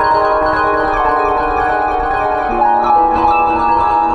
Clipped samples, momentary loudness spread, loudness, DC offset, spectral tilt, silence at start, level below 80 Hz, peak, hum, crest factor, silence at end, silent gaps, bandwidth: under 0.1%; 4 LU; -13 LUFS; under 0.1%; -6.5 dB/octave; 0 s; -32 dBFS; -2 dBFS; none; 10 dB; 0 s; none; 9.6 kHz